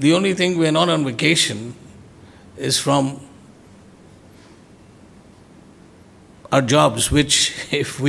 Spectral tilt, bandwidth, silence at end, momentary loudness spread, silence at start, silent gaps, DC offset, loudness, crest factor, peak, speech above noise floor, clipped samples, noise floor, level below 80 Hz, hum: -4 dB/octave; 12 kHz; 0 s; 11 LU; 0 s; none; under 0.1%; -17 LUFS; 20 dB; 0 dBFS; 29 dB; under 0.1%; -47 dBFS; -44 dBFS; none